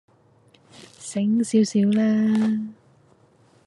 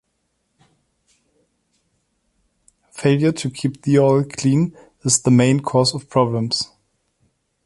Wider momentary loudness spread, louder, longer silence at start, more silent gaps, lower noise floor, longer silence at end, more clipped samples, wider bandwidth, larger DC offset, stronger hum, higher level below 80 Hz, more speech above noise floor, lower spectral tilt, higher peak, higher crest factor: first, 12 LU vs 9 LU; second, -21 LUFS vs -18 LUFS; second, 0.8 s vs 2.95 s; neither; second, -57 dBFS vs -70 dBFS; about the same, 0.95 s vs 1 s; neither; about the same, 11 kHz vs 11.5 kHz; neither; neither; second, -72 dBFS vs -58 dBFS; second, 37 dB vs 53 dB; first, -6.5 dB/octave vs -5 dB/octave; second, -8 dBFS vs -2 dBFS; about the same, 16 dB vs 20 dB